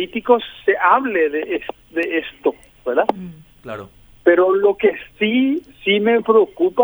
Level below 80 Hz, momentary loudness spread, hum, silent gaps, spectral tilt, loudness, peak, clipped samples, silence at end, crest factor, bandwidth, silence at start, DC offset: -54 dBFS; 14 LU; none; none; -6.5 dB/octave; -18 LUFS; 0 dBFS; under 0.1%; 0 s; 18 dB; over 20 kHz; 0 s; under 0.1%